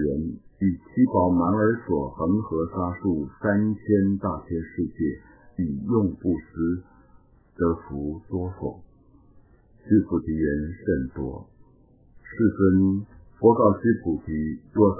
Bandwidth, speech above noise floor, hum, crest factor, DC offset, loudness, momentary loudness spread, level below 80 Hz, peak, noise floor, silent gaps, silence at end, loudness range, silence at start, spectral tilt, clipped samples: 2.1 kHz; 32 dB; none; 20 dB; under 0.1%; -25 LUFS; 12 LU; -42 dBFS; -4 dBFS; -56 dBFS; none; 0 s; 5 LU; 0 s; -15.5 dB/octave; under 0.1%